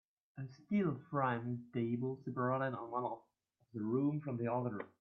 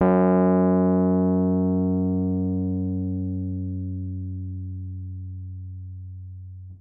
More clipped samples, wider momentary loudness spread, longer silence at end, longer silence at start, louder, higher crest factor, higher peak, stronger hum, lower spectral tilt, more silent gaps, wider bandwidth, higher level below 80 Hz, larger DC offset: neither; second, 14 LU vs 19 LU; first, 0.15 s vs 0 s; first, 0.35 s vs 0 s; second, -39 LUFS vs -23 LUFS; about the same, 18 dB vs 14 dB; second, -22 dBFS vs -8 dBFS; neither; second, -8 dB/octave vs -14.5 dB/octave; neither; first, 6 kHz vs 2.7 kHz; second, -80 dBFS vs -64 dBFS; neither